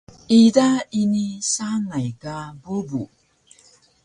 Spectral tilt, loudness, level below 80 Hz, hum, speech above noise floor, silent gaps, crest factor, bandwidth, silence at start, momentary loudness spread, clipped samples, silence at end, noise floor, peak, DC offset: -5 dB/octave; -20 LUFS; -58 dBFS; none; 35 dB; none; 18 dB; 10.5 kHz; 0.3 s; 18 LU; under 0.1%; 1 s; -55 dBFS; -2 dBFS; under 0.1%